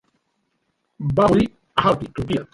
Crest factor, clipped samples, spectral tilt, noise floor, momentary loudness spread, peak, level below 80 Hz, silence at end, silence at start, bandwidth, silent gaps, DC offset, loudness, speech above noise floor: 20 dB; under 0.1%; -7.5 dB/octave; -71 dBFS; 9 LU; -2 dBFS; -44 dBFS; 0.1 s; 1 s; 11.5 kHz; none; under 0.1%; -20 LUFS; 52 dB